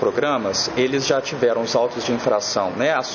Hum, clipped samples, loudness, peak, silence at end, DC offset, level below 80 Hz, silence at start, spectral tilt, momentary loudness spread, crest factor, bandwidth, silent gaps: none; under 0.1%; -20 LUFS; -4 dBFS; 0 s; under 0.1%; -56 dBFS; 0 s; -3.5 dB/octave; 2 LU; 16 dB; 7.2 kHz; none